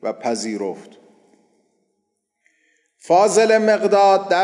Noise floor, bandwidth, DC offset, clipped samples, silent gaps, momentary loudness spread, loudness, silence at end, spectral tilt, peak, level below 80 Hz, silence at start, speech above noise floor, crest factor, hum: -73 dBFS; 11.5 kHz; under 0.1%; under 0.1%; none; 13 LU; -17 LUFS; 0 s; -3.5 dB/octave; -4 dBFS; -80 dBFS; 0.05 s; 57 dB; 16 dB; none